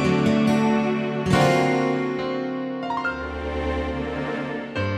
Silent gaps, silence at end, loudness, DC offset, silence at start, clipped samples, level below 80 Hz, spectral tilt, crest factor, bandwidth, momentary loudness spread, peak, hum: none; 0 s; -23 LUFS; under 0.1%; 0 s; under 0.1%; -40 dBFS; -6.5 dB/octave; 16 dB; 13 kHz; 9 LU; -6 dBFS; none